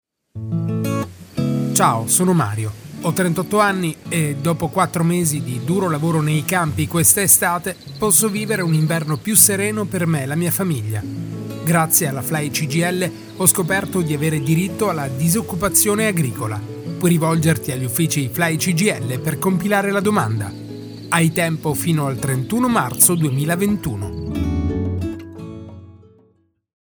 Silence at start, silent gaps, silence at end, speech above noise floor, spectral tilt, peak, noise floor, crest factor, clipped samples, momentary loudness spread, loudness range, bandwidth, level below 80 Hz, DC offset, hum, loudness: 0.35 s; none; 0.95 s; 41 dB; -4.5 dB/octave; 0 dBFS; -60 dBFS; 18 dB; under 0.1%; 13 LU; 4 LU; over 20 kHz; -44 dBFS; under 0.1%; none; -18 LUFS